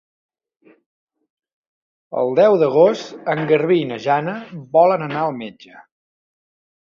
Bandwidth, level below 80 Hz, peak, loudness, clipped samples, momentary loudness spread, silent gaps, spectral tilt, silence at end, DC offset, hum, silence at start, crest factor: 7.4 kHz; -68 dBFS; -2 dBFS; -17 LUFS; under 0.1%; 14 LU; none; -7 dB/octave; 1.05 s; under 0.1%; none; 2.1 s; 18 dB